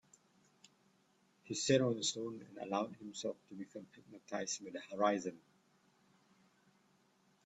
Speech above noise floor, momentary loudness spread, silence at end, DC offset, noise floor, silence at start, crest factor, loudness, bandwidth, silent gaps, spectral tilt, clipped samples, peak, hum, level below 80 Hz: 35 dB; 18 LU; 2.05 s; under 0.1%; -74 dBFS; 1.45 s; 24 dB; -39 LUFS; 10.5 kHz; none; -4 dB/octave; under 0.1%; -18 dBFS; none; -80 dBFS